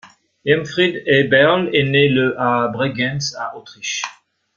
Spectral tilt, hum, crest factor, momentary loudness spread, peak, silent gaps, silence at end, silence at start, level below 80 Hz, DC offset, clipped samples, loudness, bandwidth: -4.5 dB/octave; none; 16 dB; 14 LU; -2 dBFS; none; 0.45 s; 0.05 s; -56 dBFS; under 0.1%; under 0.1%; -17 LUFS; 7.4 kHz